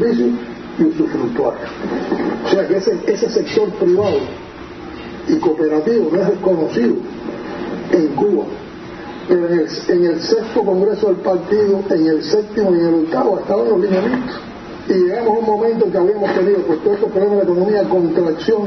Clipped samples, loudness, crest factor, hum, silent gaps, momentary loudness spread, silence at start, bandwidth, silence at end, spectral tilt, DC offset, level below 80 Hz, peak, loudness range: under 0.1%; -16 LUFS; 16 dB; none; none; 12 LU; 0 s; 6.2 kHz; 0 s; -7 dB/octave; under 0.1%; -50 dBFS; 0 dBFS; 3 LU